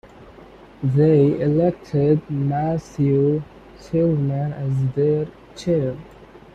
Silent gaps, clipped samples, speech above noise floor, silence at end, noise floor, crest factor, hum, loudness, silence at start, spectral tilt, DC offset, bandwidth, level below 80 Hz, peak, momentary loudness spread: none; under 0.1%; 25 dB; 0.15 s; -44 dBFS; 14 dB; none; -20 LUFS; 0.2 s; -9.5 dB/octave; under 0.1%; 8 kHz; -50 dBFS; -6 dBFS; 10 LU